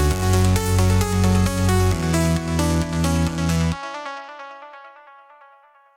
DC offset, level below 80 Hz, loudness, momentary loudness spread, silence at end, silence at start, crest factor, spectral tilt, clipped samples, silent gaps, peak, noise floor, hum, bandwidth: under 0.1%; -32 dBFS; -20 LUFS; 17 LU; 1.05 s; 0 s; 18 dB; -5.5 dB/octave; under 0.1%; none; -4 dBFS; -52 dBFS; none; 17 kHz